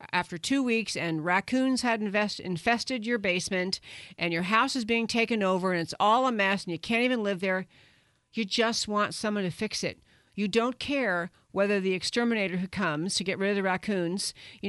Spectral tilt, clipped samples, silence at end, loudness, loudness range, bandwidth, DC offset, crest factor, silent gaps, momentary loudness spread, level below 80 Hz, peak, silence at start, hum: -4 dB/octave; under 0.1%; 0 s; -28 LUFS; 3 LU; 11.5 kHz; under 0.1%; 20 dB; none; 7 LU; -64 dBFS; -8 dBFS; 0 s; none